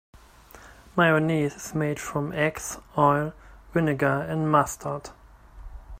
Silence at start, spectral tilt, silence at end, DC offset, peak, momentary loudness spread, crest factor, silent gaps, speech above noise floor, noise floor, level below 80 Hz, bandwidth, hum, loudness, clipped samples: 0.15 s; -6 dB/octave; 0.05 s; under 0.1%; -4 dBFS; 13 LU; 22 dB; none; 25 dB; -50 dBFS; -50 dBFS; 16 kHz; none; -25 LUFS; under 0.1%